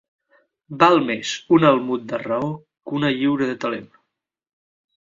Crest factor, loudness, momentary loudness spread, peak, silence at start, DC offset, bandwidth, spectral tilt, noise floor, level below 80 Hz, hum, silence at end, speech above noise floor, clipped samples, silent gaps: 22 dB; -20 LUFS; 14 LU; 0 dBFS; 0.7 s; under 0.1%; 7.6 kHz; -5.5 dB/octave; -77 dBFS; -64 dBFS; none; 1.3 s; 57 dB; under 0.1%; none